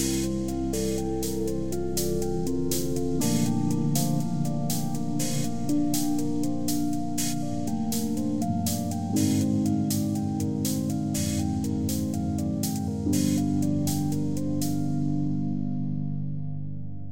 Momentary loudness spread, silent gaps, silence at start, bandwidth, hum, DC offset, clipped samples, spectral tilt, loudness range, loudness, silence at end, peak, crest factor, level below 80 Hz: 5 LU; none; 0 s; 17 kHz; none; under 0.1%; under 0.1%; -5.5 dB/octave; 1 LU; -27 LUFS; 0 s; -12 dBFS; 14 dB; -46 dBFS